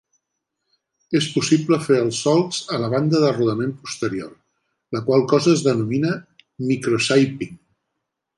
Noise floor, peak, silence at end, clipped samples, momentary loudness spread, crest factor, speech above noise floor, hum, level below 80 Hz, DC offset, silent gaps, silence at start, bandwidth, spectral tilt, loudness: -79 dBFS; -4 dBFS; 0.8 s; under 0.1%; 12 LU; 18 dB; 60 dB; none; -62 dBFS; under 0.1%; none; 1.1 s; 11.5 kHz; -5.5 dB/octave; -20 LUFS